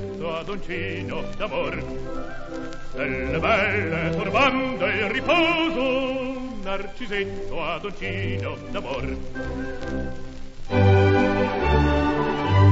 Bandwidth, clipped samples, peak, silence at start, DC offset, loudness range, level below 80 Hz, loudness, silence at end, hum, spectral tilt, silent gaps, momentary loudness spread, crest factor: 7.8 kHz; under 0.1%; -6 dBFS; 0 s; under 0.1%; 8 LU; -34 dBFS; -24 LUFS; 0 s; none; -7 dB/octave; none; 14 LU; 16 dB